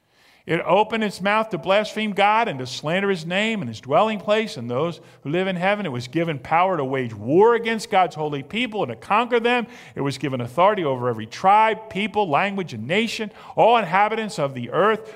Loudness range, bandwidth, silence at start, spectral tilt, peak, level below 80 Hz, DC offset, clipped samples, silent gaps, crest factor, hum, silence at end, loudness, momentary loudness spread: 2 LU; 15.5 kHz; 0.45 s; -5.5 dB/octave; -2 dBFS; -64 dBFS; under 0.1%; under 0.1%; none; 18 dB; none; 0 s; -21 LUFS; 9 LU